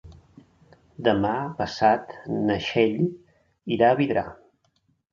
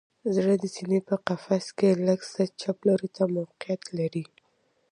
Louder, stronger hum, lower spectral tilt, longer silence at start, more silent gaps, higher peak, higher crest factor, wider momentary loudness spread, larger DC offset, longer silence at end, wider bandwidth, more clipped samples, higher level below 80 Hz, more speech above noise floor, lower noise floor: first, -24 LUFS vs -27 LUFS; neither; about the same, -7 dB/octave vs -6.5 dB/octave; second, 0.05 s vs 0.25 s; neither; first, -4 dBFS vs -8 dBFS; about the same, 20 dB vs 20 dB; about the same, 10 LU vs 8 LU; neither; first, 0.8 s vs 0.65 s; second, 7.4 kHz vs 10.5 kHz; neither; first, -54 dBFS vs -74 dBFS; about the same, 46 dB vs 43 dB; about the same, -69 dBFS vs -70 dBFS